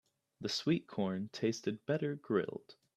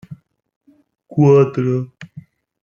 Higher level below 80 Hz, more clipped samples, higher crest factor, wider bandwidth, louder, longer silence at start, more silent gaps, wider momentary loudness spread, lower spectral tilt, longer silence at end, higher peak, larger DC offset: second, -76 dBFS vs -58 dBFS; neither; about the same, 18 dB vs 16 dB; first, 13.5 kHz vs 7 kHz; second, -37 LUFS vs -15 LUFS; first, 0.4 s vs 0.1 s; second, none vs 0.56-0.61 s; second, 8 LU vs 25 LU; second, -5.5 dB/octave vs -9.5 dB/octave; second, 0.25 s vs 0.45 s; second, -18 dBFS vs -2 dBFS; neither